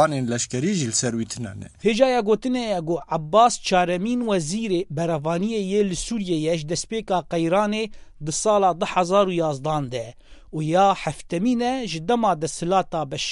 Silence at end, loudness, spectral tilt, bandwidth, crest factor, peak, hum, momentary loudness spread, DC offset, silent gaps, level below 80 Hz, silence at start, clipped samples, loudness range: 0 s; -22 LUFS; -4.5 dB/octave; 11.5 kHz; 18 dB; -4 dBFS; none; 9 LU; under 0.1%; none; -48 dBFS; 0 s; under 0.1%; 3 LU